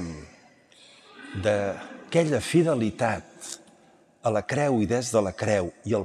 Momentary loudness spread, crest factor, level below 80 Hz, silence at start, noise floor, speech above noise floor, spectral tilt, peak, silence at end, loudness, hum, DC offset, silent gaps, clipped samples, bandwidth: 16 LU; 18 dB; -60 dBFS; 0 s; -58 dBFS; 33 dB; -5.5 dB/octave; -8 dBFS; 0 s; -26 LUFS; none; under 0.1%; none; under 0.1%; 14 kHz